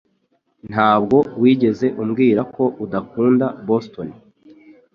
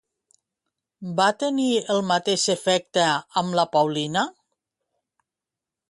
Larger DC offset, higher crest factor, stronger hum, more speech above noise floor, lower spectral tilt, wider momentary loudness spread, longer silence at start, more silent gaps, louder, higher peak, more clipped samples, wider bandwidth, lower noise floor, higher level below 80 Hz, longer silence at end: neither; about the same, 16 dB vs 18 dB; neither; second, 48 dB vs 66 dB; first, -8.5 dB/octave vs -3.5 dB/octave; first, 11 LU vs 5 LU; second, 0.65 s vs 1 s; neither; first, -18 LUFS vs -22 LUFS; first, -2 dBFS vs -6 dBFS; neither; second, 6.6 kHz vs 11.5 kHz; second, -65 dBFS vs -88 dBFS; first, -56 dBFS vs -70 dBFS; second, 0.8 s vs 1.6 s